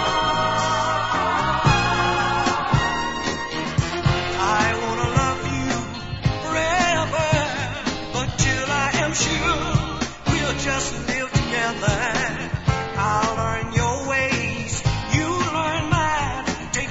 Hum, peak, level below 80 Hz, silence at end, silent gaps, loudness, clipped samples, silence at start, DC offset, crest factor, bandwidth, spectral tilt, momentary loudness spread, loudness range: none; -4 dBFS; -36 dBFS; 0 s; none; -22 LUFS; under 0.1%; 0 s; under 0.1%; 18 dB; 8 kHz; -4 dB/octave; 6 LU; 2 LU